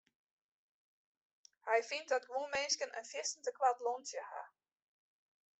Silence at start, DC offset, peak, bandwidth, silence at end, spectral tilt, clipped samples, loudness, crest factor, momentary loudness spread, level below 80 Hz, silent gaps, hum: 1.65 s; under 0.1%; -20 dBFS; 8.2 kHz; 1.15 s; 1 dB/octave; under 0.1%; -38 LUFS; 22 dB; 14 LU; -84 dBFS; none; none